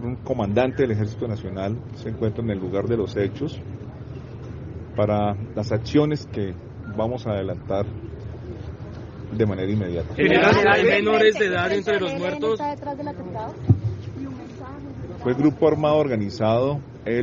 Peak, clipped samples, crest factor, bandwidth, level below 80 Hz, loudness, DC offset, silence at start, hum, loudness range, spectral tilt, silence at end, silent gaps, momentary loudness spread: -2 dBFS; under 0.1%; 22 dB; 7.2 kHz; -48 dBFS; -23 LUFS; under 0.1%; 0 s; none; 8 LU; -5.5 dB/octave; 0 s; none; 18 LU